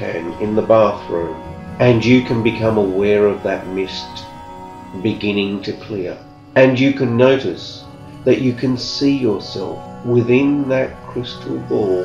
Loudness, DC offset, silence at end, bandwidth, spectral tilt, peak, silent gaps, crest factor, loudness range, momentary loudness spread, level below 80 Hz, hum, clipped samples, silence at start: -17 LUFS; under 0.1%; 0 s; 8.6 kHz; -7 dB/octave; 0 dBFS; none; 16 dB; 4 LU; 17 LU; -46 dBFS; none; under 0.1%; 0 s